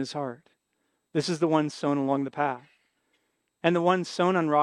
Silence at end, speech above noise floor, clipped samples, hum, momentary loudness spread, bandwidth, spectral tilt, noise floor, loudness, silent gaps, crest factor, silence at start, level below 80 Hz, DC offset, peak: 0 s; 51 dB; under 0.1%; none; 9 LU; 11 kHz; -6 dB/octave; -76 dBFS; -27 LUFS; none; 20 dB; 0 s; -80 dBFS; under 0.1%; -8 dBFS